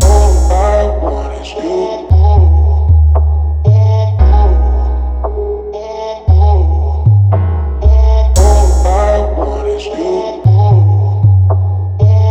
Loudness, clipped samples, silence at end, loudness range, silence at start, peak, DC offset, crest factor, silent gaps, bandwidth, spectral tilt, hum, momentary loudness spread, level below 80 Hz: -11 LUFS; under 0.1%; 0 s; 2 LU; 0 s; 0 dBFS; under 0.1%; 8 dB; none; 10 kHz; -7.5 dB/octave; none; 9 LU; -12 dBFS